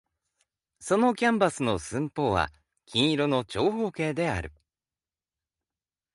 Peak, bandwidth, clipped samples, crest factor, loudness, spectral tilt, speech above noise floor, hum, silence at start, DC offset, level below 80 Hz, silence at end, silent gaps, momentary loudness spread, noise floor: -8 dBFS; 11.5 kHz; under 0.1%; 20 dB; -27 LUFS; -5 dB/octave; over 64 dB; none; 0.8 s; under 0.1%; -52 dBFS; 1.65 s; none; 9 LU; under -90 dBFS